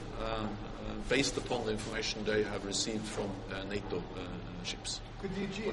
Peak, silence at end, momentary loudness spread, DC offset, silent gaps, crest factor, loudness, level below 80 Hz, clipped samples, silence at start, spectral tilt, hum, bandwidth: -14 dBFS; 0 s; 10 LU; under 0.1%; none; 22 dB; -36 LUFS; -48 dBFS; under 0.1%; 0 s; -4 dB/octave; none; 11.5 kHz